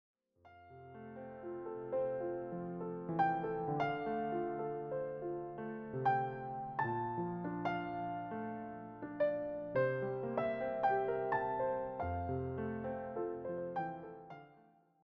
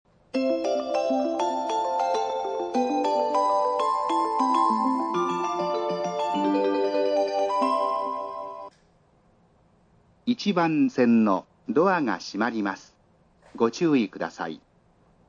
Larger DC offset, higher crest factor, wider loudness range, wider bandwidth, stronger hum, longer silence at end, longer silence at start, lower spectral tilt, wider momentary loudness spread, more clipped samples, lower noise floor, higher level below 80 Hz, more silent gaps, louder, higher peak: neither; about the same, 18 dB vs 16 dB; about the same, 4 LU vs 4 LU; second, 6.2 kHz vs 9.4 kHz; neither; second, 0.5 s vs 0.7 s; about the same, 0.45 s vs 0.35 s; about the same, -6.5 dB/octave vs -5.5 dB/octave; first, 13 LU vs 10 LU; neither; first, -67 dBFS vs -61 dBFS; about the same, -66 dBFS vs -70 dBFS; neither; second, -39 LUFS vs -25 LUFS; second, -22 dBFS vs -8 dBFS